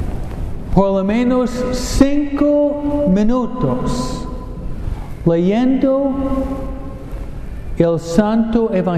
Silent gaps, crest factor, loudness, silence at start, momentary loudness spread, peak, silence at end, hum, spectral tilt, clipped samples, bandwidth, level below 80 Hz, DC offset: none; 16 dB; -17 LUFS; 0 s; 15 LU; 0 dBFS; 0 s; none; -7 dB/octave; under 0.1%; 13.5 kHz; -26 dBFS; under 0.1%